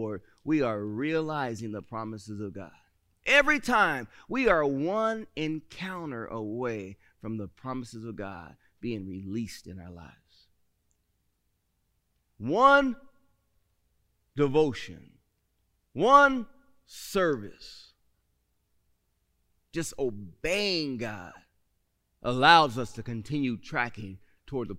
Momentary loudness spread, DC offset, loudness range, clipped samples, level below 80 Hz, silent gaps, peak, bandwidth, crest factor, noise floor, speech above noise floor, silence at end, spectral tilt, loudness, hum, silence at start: 23 LU; under 0.1%; 13 LU; under 0.1%; -56 dBFS; none; -4 dBFS; 16 kHz; 26 dB; -76 dBFS; 48 dB; 0 s; -5 dB/octave; -27 LUFS; none; 0 s